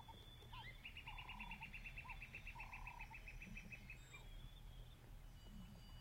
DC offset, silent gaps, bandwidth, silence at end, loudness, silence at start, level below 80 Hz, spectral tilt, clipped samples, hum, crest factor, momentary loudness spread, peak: under 0.1%; none; 16 kHz; 0 s; -56 LUFS; 0 s; -60 dBFS; -4 dB/octave; under 0.1%; none; 14 dB; 8 LU; -40 dBFS